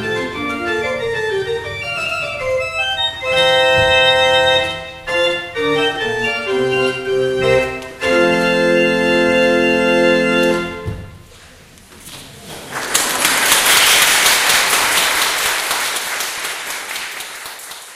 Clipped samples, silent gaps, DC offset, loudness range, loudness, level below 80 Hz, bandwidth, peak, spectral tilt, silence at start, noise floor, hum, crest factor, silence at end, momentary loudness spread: under 0.1%; none; under 0.1%; 6 LU; -14 LUFS; -44 dBFS; 16 kHz; 0 dBFS; -2 dB/octave; 0 s; -42 dBFS; none; 16 dB; 0 s; 14 LU